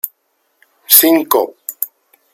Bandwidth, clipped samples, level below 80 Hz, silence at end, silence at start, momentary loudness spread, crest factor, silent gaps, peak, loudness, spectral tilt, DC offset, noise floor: over 20 kHz; 0.4%; -66 dBFS; 0.5 s; 0.05 s; 16 LU; 16 dB; none; 0 dBFS; -11 LUFS; -1 dB/octave; under 0.1%; -64 dBFS